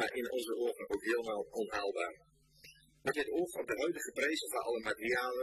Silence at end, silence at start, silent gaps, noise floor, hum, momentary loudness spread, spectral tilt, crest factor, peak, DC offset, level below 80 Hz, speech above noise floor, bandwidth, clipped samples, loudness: 0 s; 0 s; none; -61 dBFS; none; 4 LU; -3 dB/octave; 18 dB; -20 dBFS; under 0.1%; -70 dBFS; 25 dB; 14.5 kHz; under 0.1%; -37 LUFS